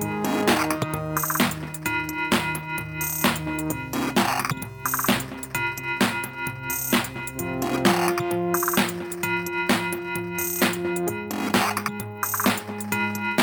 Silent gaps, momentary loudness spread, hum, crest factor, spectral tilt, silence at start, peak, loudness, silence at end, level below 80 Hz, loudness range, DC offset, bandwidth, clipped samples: none; 7 LU; none; 18 dB; -3.5 dB/octave; 0 s; -6 dBFS; -24 LUFS; 0 s; -52 dBFS; 1 LU; under 0.1%; 19 kHz; under 0.1%